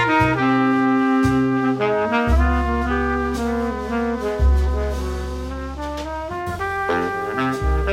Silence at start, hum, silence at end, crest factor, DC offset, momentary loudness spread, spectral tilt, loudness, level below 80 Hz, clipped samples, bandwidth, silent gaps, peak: 0 s; none; 0 s; 16 dB; under 0.1%; 10 LU; -7 dB/octave; -21 LUFS; -26 dBFS; under 0.1%; 13 kHz; none; -4 dBFS